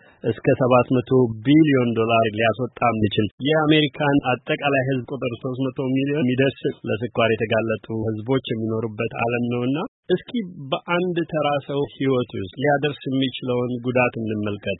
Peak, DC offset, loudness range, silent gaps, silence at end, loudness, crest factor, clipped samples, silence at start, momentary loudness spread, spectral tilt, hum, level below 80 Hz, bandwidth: -2 dBFS; under 0.1%; 5 LU; 3.31-3.38 s, 9.88-10.03 s; 0.05 s; -22 LUFS; 18 dB; under 0.1%; 0.25 s; 9 LU; -11.5 dB/octave; none; -56 dBFS; 4.1 kHz